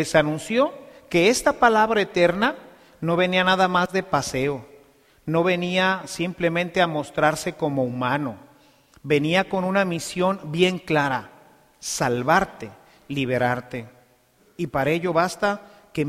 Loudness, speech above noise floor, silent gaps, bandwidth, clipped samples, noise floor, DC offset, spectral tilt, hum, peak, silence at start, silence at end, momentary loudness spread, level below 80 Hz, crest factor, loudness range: -22 LUFS; 37 dB; none; 15.5 kHz; under 0.1%; -59 dBFS; under 0.1%; -4.5 dB/octave; none; -4 dBFS; 0 s; 0 s; 12 LU; -54 dBFS; 20 dB; 5 LU